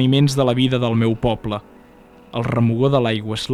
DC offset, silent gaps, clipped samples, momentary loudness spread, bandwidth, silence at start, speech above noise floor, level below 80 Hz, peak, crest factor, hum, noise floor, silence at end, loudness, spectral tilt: under 0.1%; none; under 0.1%; 10 LU; 13.5 kHz; 0 s; 28 dB; -44 dBFS; -2 dBFS; 16 dB; none; -46 dBFS; 0 s; -19 LUFS; -6.5 dB/octave